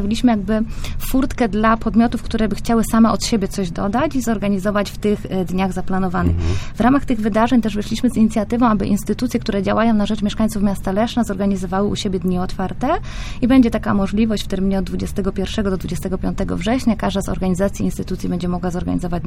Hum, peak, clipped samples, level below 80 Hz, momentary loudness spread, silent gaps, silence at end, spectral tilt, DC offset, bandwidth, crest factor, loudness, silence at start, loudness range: none; -2 dBFS; under 0.1%; -30 dBFS; 7 LU; none; 0 s; -6 dB/octave; under 0.1%; 16 kHz; 16 dB; -19 LUFS; 0 s; 3 LU